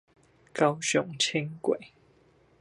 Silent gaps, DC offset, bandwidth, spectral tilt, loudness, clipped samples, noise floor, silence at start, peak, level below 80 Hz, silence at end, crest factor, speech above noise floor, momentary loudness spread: none; under 0.1%; 11.5 kHz; -3.5 dB/octave; -28 LUFS; under 0.1%; -62 dBFS; 0.55 s; -8 dBFS; -72 dBFS; 0.75 s; 22 dB; 34 dB; 7 LU